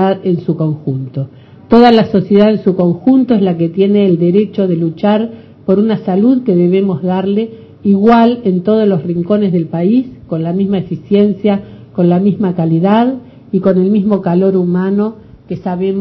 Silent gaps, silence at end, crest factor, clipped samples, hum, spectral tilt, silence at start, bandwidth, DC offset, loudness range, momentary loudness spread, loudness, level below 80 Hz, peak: none; 0 s; 12 dB; 0.2%; none; -10.5 dB/octave; 0 s; 5.6 kHz; under 0.1%; 3 LU; 10 LU; -12 LUFS; -48 dBFS; 0 dBFS